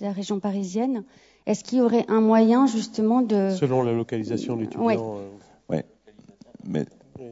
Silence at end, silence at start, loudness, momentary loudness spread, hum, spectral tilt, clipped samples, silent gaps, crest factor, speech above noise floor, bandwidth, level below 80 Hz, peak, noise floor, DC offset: 0 s; 0 s; -23 LUFS; 16 LU; none; -7 dB/octave; under 0.1%; none; 16 dB; 30 dB; 8 kHz; -68 dBFS; -6 dBFS; -53 dBFS; under 0.1%